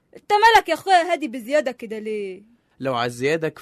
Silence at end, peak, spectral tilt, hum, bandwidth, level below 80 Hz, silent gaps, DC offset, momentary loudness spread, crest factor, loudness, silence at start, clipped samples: 0 s; -4 dBFS; -4 dB/octave; none; 13.5 kHz; -56 dBFS; none; under 0.1%; 15 LU; 16 dB; -20 LUFS; 0.15 s; under 0.1%